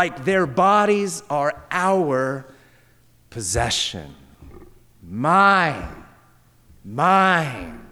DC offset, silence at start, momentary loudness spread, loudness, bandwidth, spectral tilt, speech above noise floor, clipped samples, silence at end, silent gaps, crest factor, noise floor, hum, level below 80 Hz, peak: under 0.1%; 0 s; 18 LU; -19 LUFS; 19.5 kHz; -4 dB/octave; 35 dB; under 0.1%; 0.05 s; none; 16 dB; -55 dBFS; none; -46 dBFS; -4 dBFS